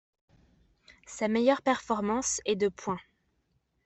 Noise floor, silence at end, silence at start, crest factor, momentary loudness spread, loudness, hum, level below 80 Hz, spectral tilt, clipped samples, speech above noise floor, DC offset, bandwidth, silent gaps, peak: -75 dBFS; 0.85 s; 1.1 s; 20 dB; 11 LU; -29 LUFS; none; -64 dBFS; -3.5 dB/octave; under 0.1%; 46 dB; under 0.1%; 8.4 kHz; none; -12 dBFS